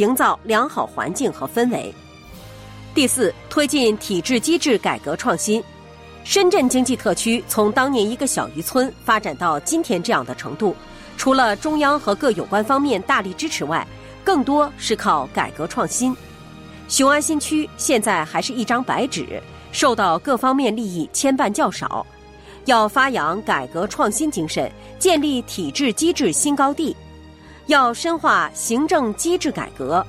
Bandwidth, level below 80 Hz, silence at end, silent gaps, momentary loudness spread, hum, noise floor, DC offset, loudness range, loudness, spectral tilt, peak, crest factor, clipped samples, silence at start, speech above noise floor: 16 kHz; -48 dBFS; 0 s; none; 9 LU; none; -42 dBFS; under 0.1%; 2 LU; -19 LUFS; -3 dB/octave; -4 dBFS; 16 dB; under 0.1%; 0 s; 23 dB